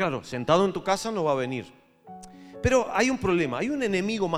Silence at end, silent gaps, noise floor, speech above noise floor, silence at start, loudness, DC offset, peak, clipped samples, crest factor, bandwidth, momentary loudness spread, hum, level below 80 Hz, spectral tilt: 0 s; none; -47 dBFS; 21 dB; 0 s; -26 LUFS; under 0.1%; -6 dBFS; under 0.1%; 20 dB; 15 kHz; 17 LU; none; -50 dBFS; -5 dB/octave